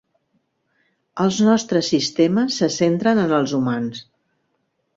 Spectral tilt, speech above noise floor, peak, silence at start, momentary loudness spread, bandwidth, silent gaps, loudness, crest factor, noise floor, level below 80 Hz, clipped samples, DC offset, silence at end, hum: -5 dB/octave; 52 dB; -4 dBFS; 1.15 s; 8 LU; 7.8 kHz; none; -19 LUFS; 16 dB; -71 dBFS; -60 dBFS; under 0.1%; under 0.1%; 0.95 s; none